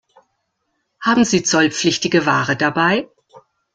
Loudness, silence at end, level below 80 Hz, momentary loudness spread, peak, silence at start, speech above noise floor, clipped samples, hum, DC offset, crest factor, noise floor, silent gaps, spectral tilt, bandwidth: -16 LUFS; 0.35 s; -56 dBFS; 6 LU; -2 dBFS; 1 s; 55 dB; under 0.1%; none; under 0.1%; 16 dB; -71 dBFS; none; -3.5 dB/octave; 9.6 kHz